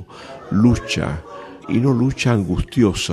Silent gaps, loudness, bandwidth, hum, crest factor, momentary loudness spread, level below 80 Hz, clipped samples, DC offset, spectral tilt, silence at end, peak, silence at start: none; -19 LUFS; 13.5 kHz; none; 16 dB; 19 LU; -36 dBFS; under 0.1%; under 0.1%; -6 dB/octave; 0 s; -2 dBFS; 0 s